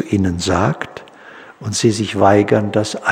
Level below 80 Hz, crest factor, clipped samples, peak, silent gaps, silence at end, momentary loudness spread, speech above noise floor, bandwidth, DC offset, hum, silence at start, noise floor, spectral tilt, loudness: -46 dBFS; 16 dB; under 0.1%; -2 dBFS; none; 0 s; 15 LU; 24 dB; 15.5 kHz; under 0.1%; none; 0 s; -39 dBFS; -5 dB/octave; -16 LUFS